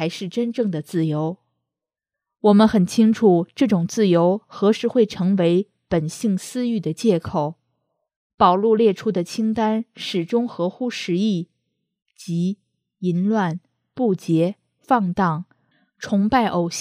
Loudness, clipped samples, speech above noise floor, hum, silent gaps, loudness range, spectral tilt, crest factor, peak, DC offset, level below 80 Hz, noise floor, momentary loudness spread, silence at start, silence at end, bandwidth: -20 LUFS; under 0.1%; 67 dB; none; 8.16-8.38 s; 7 LU; -6.5 dB/octave; 18 dB; -2 dBFS; under 0.1%; -56 dBFS; -87 dBFS; 10 LU; 0 s; 0 s; 14.5 kHz